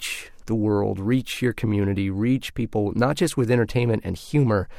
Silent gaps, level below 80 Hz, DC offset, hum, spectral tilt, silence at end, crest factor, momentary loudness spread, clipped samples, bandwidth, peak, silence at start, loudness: none; -46 dBFS; under 0.1%; none; -6.5 dB/octave; 0 s; 16 dB; 6 LU; under 0.1%; 16 kHz; -6 dBFS; 0 s; -23 LUFS